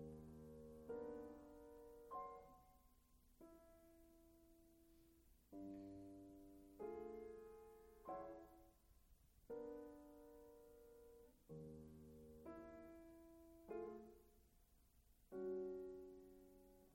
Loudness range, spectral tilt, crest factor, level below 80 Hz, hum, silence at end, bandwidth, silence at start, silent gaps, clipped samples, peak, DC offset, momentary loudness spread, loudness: 7 LU; -7.5 dB/octave; 18 dB; -74 dBFS; none; 0 s; 16.5 kHz; 0 s; none; under 0.1%; -40 dBFS; under 0.1%; 14 LU; -58 LUFS